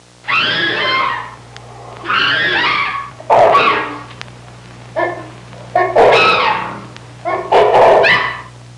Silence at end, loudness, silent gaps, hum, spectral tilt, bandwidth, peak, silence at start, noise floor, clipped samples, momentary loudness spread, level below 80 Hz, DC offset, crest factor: 0 s; -12 LUFS; none; none; -4 dB/octave; 11 kHz; -2 dBFS; 0.25 s; -35 dBFS; under 0.1%; 22 LU; -48 dBFS; under 0.1%; 12 dB